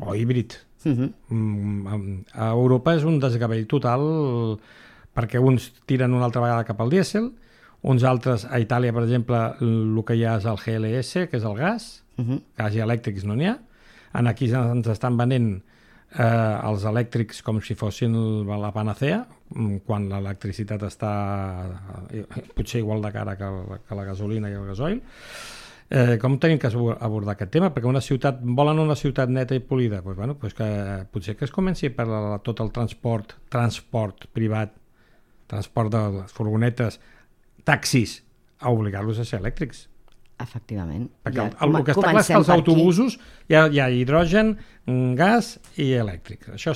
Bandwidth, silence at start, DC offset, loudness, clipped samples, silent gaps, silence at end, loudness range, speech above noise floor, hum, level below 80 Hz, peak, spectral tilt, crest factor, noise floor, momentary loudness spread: 13.5 kHz; 0 s; under 0.1%; -23 LUFS; under 0.1%; none; 0 s; 9 LU; 33 dB; none; -46 dBFS; -2 dBFS; -7 dB/octave; 20 dB; -56 dBFS; 13 LU